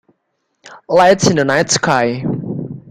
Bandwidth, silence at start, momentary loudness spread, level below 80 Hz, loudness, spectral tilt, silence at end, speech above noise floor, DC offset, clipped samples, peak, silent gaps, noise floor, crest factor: 14 kHz; 0.65 s; 12 LU; -48 dBFS; -14 LUFS; -4 dB/octave; 0 s; 56 dB; under 0.1%; under 0.1%; 0 dBFS; none; -69 dBFS; 16 dB